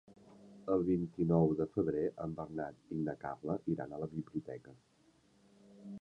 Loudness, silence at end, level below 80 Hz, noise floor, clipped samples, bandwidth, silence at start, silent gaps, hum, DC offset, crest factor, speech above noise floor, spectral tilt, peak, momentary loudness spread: -37 LUFS; 0 s; -64 dBFS; -69 dBFS; under 0.1%; 6.8 kHz; 0.1 s; none; none; under 0.1%; 22 dB; 33 dB; -10.5 dB/octave; -16 dBFS; 15 LU